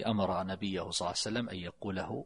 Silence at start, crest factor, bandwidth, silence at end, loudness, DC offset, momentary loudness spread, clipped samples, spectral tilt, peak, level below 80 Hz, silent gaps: 0 s; 18 dB; 11 kHz; 0 s; -35 LUFS; under 0.1%; 7 LU; under 0.1%; -4.5 dB/octave; -18 dBFS; -62 dBFS; none